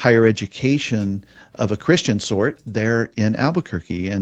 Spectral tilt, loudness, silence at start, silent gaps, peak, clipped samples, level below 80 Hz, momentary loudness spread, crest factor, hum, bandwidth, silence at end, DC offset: -6 dB/octave; -20 LUFS; 0 s; none; 0 dBFS; under 0.1%; -50 dBFS; 8 LU; 18 dB; none; 8.8 kHz; 0 s; under 0.1%